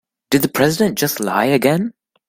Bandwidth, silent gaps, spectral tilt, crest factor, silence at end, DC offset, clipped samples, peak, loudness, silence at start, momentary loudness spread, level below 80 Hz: 16.5 kHz; none; -4.5 dB/octave; 16 dB; 0.4 s; under 0.1%; under 0.1%; 0 dBFS; -17 LUFS; 0.3 s; 5 LU; -52 dBFS